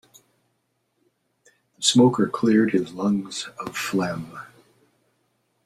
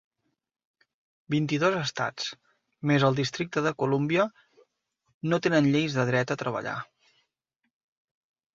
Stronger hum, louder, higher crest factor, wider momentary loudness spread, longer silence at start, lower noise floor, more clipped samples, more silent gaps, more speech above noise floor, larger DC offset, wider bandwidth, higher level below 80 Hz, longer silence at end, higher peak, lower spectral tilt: neither; first, -22 LUFS vs -27 LUFS; about the same, 20 dB vs 20 dB; first, 15 LU vs 12 LU; first, 1.8 s vs 1.3 s; second, -72 dBFS vs -81 dBFS; neither; second, none vs 5.14-5.21 s; second, 51 dB vs 55 dB; neither; first, 14.5 kHz vs 7.6 kHz; about the same, -64 dBFS vs -68 dBFS; second, 1.2 s vs 1.7 s; first, -4 dBFS vs -8 dBFS; second, -4.5 dB/octave vs -6 dB/octave